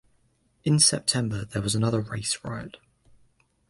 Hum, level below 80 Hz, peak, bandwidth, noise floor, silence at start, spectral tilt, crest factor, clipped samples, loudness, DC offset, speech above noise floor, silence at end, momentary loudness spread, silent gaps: none; -54 dBFS; -6 dBFS; 11.5 kHz; -67 dBFS; 0.65 s; -3.5 dB/octave; 22 dB; under 0.1%; -24 LUFS; under 0.1%; 41 dB; 0.95 s; 16 LU; none